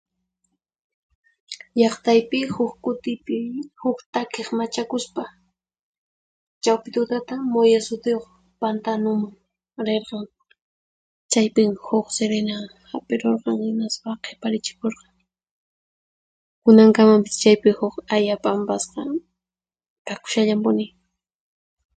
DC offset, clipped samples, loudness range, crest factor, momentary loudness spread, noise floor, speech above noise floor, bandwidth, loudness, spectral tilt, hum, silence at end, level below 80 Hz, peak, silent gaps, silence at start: under 0.1%; under 0.1%; 10 LU; 22 dB; 16 LU; under -90 dBFS; over 70 dB; 9.4 kHz; -21 LUFS; -5 dB/octave; none; 1.1 s; -66 dBFS; 0 dBFS; 4.06-4.13 s, 5.79-6.61 s, 10.61-11.29 s, 15.51-16.62 s, 19.90-20.05 s; 1.5 s